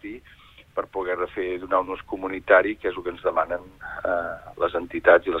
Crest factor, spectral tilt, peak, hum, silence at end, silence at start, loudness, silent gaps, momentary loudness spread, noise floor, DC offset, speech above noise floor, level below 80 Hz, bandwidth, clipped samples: 22 dB; -6.5 dB/octave; -2 dBFS; none; 0 s; 0.05 s; -24 LUFS; none; 14 LU; -51 dBFS; under 0.1%; 27 dB; -52 dBFS; 4.5 kHz; under 0.1%